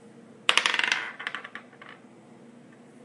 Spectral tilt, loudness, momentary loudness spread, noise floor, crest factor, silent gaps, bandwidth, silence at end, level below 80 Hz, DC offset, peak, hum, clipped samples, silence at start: 0 dB/octave; -26 LUFS; 25 LU; -51 dBFS; 32 dB; none; 11.5 kHz; 0 s; -86 dBFS; under 0.1%; 0 dBFS; none; under 0.1%; 0.05 s